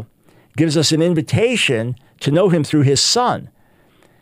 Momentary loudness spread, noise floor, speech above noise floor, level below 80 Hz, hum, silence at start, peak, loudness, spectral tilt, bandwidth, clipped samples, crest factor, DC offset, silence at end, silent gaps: 11 LU; -53 dBFS; 38 dB; -54 dBFS; none; 0 s; -2 dBFS; -16 LUFS; -4.5 dB/octave; 16 kHz; under 0.1%; 16 dB; under 0.1%; 0.75 s; none